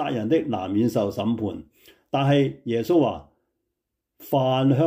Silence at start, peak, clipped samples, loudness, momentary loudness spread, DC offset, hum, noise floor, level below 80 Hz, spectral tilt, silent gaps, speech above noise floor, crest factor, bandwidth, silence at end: 0 s; -10 dBFS; under 0.1%; -23 LUFS; 8 LU; under 0.1%; none; -81 dBFS; -62 dBFS; -7.5 dB/octave; none; 59 dB; 14 dB; 16 kHz; 0 s